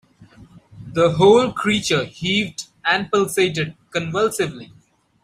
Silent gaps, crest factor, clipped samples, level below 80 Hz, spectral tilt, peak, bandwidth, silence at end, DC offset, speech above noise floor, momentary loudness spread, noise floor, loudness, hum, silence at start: none; 18 dB; under 0.1%; -54 dBFS; -4.5 dB/octave; -2 dBFS; 15.5 kHz; 0.6 s; under 0.1%; 28 dB; 12 LU; -47 dBFS; -19 LUFS; none; 0.2 s